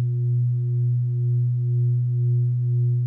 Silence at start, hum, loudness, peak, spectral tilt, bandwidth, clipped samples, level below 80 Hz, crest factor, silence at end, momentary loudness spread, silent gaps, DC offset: 0 s; none; -22 LUFS; -16 dBFS; -13.5 dB/octave; 0.4 kHz; under 0.1%; -68 dBFS; 6 dB; 0 s; 1 LU; none; under 0.1%